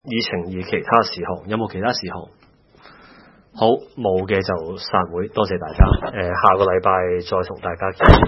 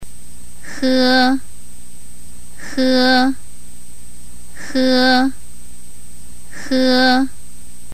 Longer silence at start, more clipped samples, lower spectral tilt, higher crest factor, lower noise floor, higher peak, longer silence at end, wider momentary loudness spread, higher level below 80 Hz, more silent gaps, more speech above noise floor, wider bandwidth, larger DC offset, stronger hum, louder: about the same, 0.05 s vs 0 s; neither; first, -7.5 dB/octave vs -3.5 dB/octave; about the same, 18 dB vs 14 dB; first, -48 dBFS vs -41 dBFS; first, 0 dBFS vs -4 dBFS; second, 0 s vs 0.65 s; second, 9 LU vs 23 LU; first, -28 dBFS vs -44 dBFS; neither; about the same, 30 dB vs 27 dB; second, 6 kHz vs 15.5 kHz; second, under 0.1% vs 9%; second, none vs 60 Hz at -50 dBFS; second, -20 LUFS vs -15 LUFS